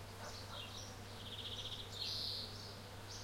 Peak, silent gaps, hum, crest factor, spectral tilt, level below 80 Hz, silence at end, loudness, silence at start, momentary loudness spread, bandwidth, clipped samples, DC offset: -30 dBFS; none; none; 18 dB; -3 dB/octave; -62 dBFS; 0 s; -45 LUFS; 0 s; 10 LU; 16.5 kHz; under 0.1%; under 0.1%